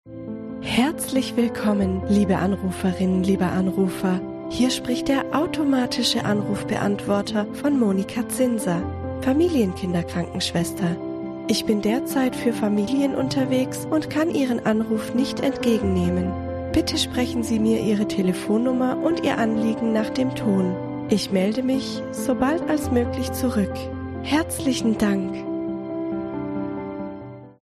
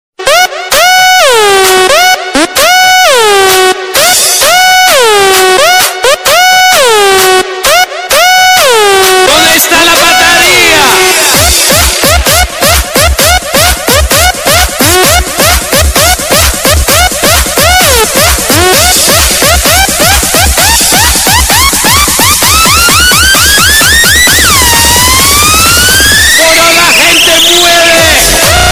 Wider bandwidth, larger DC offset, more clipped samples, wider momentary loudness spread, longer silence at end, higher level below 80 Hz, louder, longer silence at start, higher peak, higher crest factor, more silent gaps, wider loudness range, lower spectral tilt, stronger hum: second, 14 kHz vs over 20 kHz; neither; second, under 0.1% vs 7%; first, 8 LU vs 4 LU; about the same, 0.1 s vs 0 s; second, -46 dBFS vs -18 dBFS; second, -23 LUFS vs -3 LUFS; second, 0.05 s vs 0.2 s; second, -6 dBFS vs 0 dBFS; first, 16 dB vs 4 dB; neither; about the same, 2 LU vs 3 LU; first, -5.5 dB/octave vs -1.5 dB/octave; neither